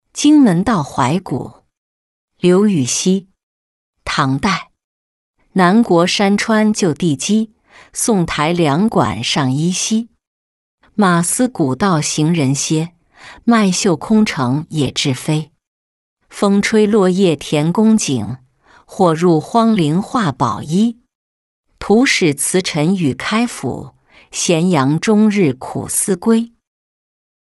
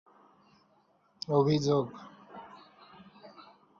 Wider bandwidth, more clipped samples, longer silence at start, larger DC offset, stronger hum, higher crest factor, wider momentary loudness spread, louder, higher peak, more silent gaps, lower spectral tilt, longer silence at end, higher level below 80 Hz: first, 12 kHz vs 7.2 kHz; neither; second, 0.15 s vs 1.3 s; neither; neither; second, 14 dB vs 20 dB; second, 10 LU vs 26 LU; first, -15 LUFS vs -29 LUFS; first, -2 dBFS vs -14 dBFS; first, 1.78-2.28 s, 3.43-3.93 s, 4.84-5.34 s, 10.27-10.78 s, 15.67-16.17 s, 21.15-21.64 s vs none; second, -5 dB/octave vs -7 dB/octave; first, 1.1 s vs 0.4 s; first, -48 dBFS vs -70 dBFS